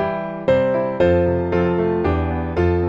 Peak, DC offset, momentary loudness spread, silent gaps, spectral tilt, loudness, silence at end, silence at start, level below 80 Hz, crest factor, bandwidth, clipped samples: -4 dBFS; under 0.1%; 5 LU; none; -9.5 dB/octave; -19 LUFS; 0 s; 0 s; -34 dBFS; 14 dB; 7.2 kHz; under 0.1%